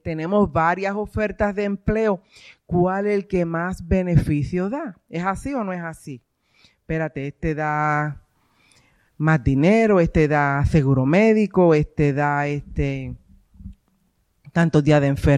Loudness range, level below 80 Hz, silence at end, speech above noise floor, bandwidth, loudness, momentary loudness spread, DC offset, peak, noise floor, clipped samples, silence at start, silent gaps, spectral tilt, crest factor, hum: 9 LU; -38 dBFS; 0 s; 46 dB; 11.5 kHz; -21 LUFS; 12 LU; under 0.1%; -4 dBFS; -66 dBFS; under 0.1%; 0.05 s; none; -8 dB/octave; 16 dB; none